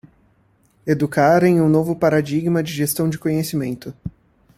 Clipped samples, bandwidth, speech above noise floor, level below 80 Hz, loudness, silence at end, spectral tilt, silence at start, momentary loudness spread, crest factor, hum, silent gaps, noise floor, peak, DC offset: under 0.1%; 16 kHz; 41 dB; -52 dBFS; -18 LUFS; 0.5 s; -6.5 dB/octave; 0.85 s; 17 LU; 16 dB; none; none; -59 dBFS; -2 dBFS; under 0.1%